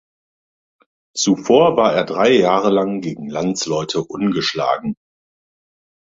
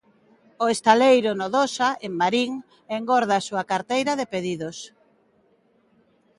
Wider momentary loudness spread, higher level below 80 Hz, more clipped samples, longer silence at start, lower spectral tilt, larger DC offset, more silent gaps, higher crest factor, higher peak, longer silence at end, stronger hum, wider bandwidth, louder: about the same, 12 LU vs 14 LU; first, -58 dBFS vs -70 dBFS; neither; first, 1.15 s vs 0.6 s; about the same, -4.5 dB/octave vs -4 dB/octave; neither; neither; about the same, 18 dB vs 22 dB; about the same, -2 dBFS vs -2 dBFS; second, 1.2 s vs 1.5 s; neither; second, 8 kHz vs 11.5 kHz; first, -17 LUFS vs -22 LUFS